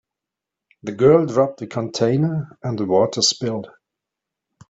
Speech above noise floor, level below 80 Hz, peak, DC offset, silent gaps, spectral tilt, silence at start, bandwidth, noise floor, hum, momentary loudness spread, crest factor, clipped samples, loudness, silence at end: 67 dB; -60 dBFS; -2 dBFS; under 0.1%; none; -5 dB/octave; 0.85 s; 8.2 kHz; -85 dBFS; none; 13 LU; 18 dB; under 0.1%; -19 LUFS; 1.05 s